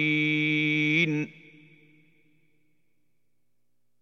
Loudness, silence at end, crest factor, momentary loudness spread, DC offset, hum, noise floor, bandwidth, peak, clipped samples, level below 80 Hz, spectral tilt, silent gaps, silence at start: -24 LUFS; 2.7 s; 18 dB; 8 LU; under 0.1%; 60 Hz at -75 dBFS; -81 dBFS; 7 kHz; -12 dBFS; under 0.1%; -88 dBFS; -6 dB/octave; none; 0 s